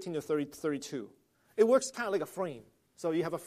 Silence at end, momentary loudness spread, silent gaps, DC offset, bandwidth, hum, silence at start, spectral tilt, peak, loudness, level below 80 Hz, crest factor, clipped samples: 0 s; 16 LU; none; under 0.1%; 15 kHz; none; 0 s; -5 dB/octave; -12 dBFS; -33 LUFS; -78 dBFS; 20 dB; under 0.1%